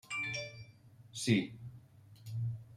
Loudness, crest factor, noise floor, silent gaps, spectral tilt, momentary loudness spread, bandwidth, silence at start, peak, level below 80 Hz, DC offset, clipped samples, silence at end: -37 LUFS; 22 dB; -59 dBFS; none; -5 dB/octave; 22 LU; 14.5 kHz; 0.05 s; -16 dBFS; -70 dBFS; under 0.1%; under 0.1%; 0 s